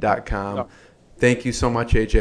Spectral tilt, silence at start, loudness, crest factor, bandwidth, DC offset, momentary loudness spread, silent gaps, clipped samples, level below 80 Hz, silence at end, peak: -6 dB/octave; 0 s; -22 LUFS; 18 dB; 11 kHz; under 0.1%; 10 LU; none; under 0.1%; -28 dBFS; 0 s; -2 dBFS